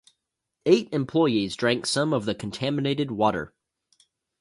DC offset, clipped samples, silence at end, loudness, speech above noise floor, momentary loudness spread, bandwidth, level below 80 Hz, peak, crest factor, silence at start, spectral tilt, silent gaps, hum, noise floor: under 0.1%; under 0.1%; 0.95 s; -25 LUFS; 57 dB; 8 LU; 11.5 kHz; -60 dBFS; -6 dBFS; 20 dB; 0.65 s; -5 dB/octave; none; none; -81 dBFS